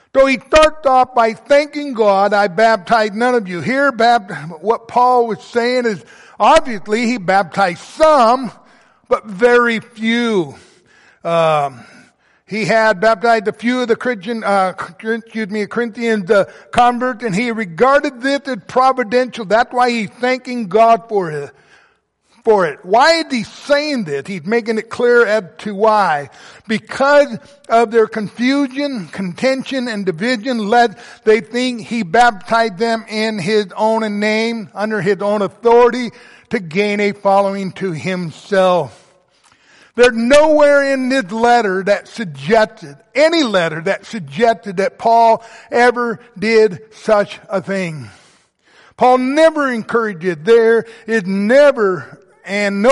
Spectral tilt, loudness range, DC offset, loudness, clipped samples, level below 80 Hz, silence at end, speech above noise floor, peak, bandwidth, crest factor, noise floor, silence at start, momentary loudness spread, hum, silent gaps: -5 dB/octave; 3 LU; under 0.1%; -15 LUFS; under 0.1%; -48 dBFS; 0 s; 43 dB; 0 dBFS; 11.5 kHz; 14 dB; -58 dBFS; 0.15 s; 10 LU; none; none